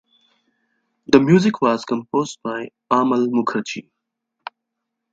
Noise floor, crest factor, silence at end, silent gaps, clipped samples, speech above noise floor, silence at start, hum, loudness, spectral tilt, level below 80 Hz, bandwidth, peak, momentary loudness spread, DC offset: -79 dBFS; 20 dB; 1.3 s; none; under 0.1%; 61 dB; 1.1 s; none; -19 LUFS; -6.5 dB/octave; -62 dBFS; 8 kHz; 0 dBFS; 22 LU; under 0.1%